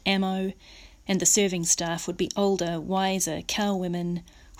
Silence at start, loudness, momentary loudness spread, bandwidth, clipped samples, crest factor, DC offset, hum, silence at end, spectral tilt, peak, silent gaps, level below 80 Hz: 0.05 s; -25 LUFS; 10 LU; 16 kHz; under 0.1%; 18 dB; under 0.1%; none; 0.05 s; -3.5 dB/octave; -8 dBFS; none; -54 dBFS